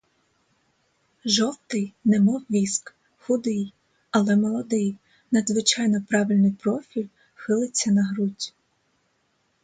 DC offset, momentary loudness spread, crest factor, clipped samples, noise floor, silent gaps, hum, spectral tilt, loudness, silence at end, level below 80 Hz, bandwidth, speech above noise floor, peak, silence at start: under 0.1%; 13 LU; 20 dB; under 0.1%; -69 dBFS; none; none; -4.5 dB/octave; -24 LUFS; 1.15 s; -68 dBFS; 9.4 kHz; 47 dB; -4 dBFS; 1.25 s